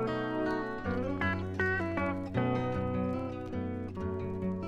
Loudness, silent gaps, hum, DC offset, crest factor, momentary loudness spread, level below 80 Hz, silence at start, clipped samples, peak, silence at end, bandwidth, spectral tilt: -34 LUFS; none; none; under 0.1%; 18 dB; 6 LU; -52 dBFS; 0 s; under 0.1%; -16 dBFS; 0 s; 9.2 kHz; -8 dB/octave